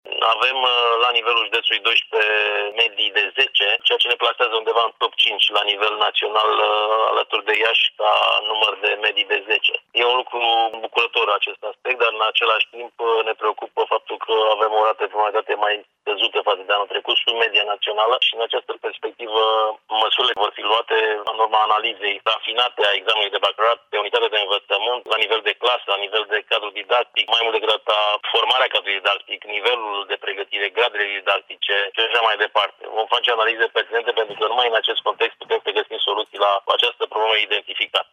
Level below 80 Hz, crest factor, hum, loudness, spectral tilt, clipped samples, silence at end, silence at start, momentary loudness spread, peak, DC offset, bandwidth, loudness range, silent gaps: -78 dBFS; 16 dB; none; -19 LUFS; -0.5 dB/octave; under 0.1%; 0.1 s; 0.05 s; 6 LU; -4 dBFS; under 0.1%; 11.5 kHz; 3 LU; none